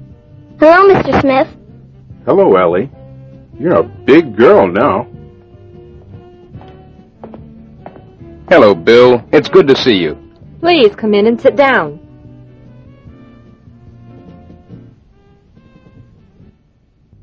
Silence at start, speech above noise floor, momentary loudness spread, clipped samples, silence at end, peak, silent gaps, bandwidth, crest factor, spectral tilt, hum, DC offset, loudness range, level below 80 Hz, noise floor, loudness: 0 s; 43 dB; 13 LU; 0.7%; 2.5 s; 0 dBFS; none; 7.2 kHz; 12 dB; -6.5 dB/octave; none; under 0.1%; 7 LU; -42 dBFS; -52 dBFS; -10 LUFS